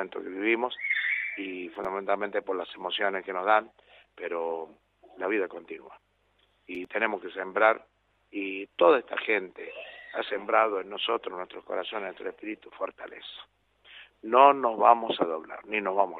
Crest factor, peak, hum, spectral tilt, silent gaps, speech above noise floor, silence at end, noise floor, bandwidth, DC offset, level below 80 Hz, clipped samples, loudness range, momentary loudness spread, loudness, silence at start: 26 dB; -4 dBFS; 50 Hz at -75 dBFS; -6 dB/octave; none; 41 dB; 0 s; -69 dBFS; 4.6 kHz; under 0.1%; -74 dBFS; under 0.1%; 8 LU; 18 LU; -28 LUFS; 0 s